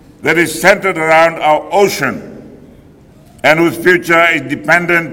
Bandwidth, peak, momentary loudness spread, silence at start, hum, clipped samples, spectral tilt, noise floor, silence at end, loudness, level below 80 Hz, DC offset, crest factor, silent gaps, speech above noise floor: 17.5 kHz; 0 dBFS; 6 LU; 0.2 s; none; 0.8%; -4.5 dB/octave; -41 dBFS; 0 s; -11 LUFS; -48 dBFS; under 0.1%; 12 dB; none; 30 dB